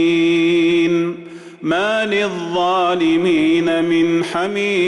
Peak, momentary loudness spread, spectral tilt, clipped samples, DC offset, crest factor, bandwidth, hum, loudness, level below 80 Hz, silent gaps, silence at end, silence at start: -8 dBFS; 6 LU; -5.5 dB/octave; under 0.1%; under 0.1%; 8 dB; 11 kHz; none; -16 LUFS; -56 dBFS; none; 0 s; 0 s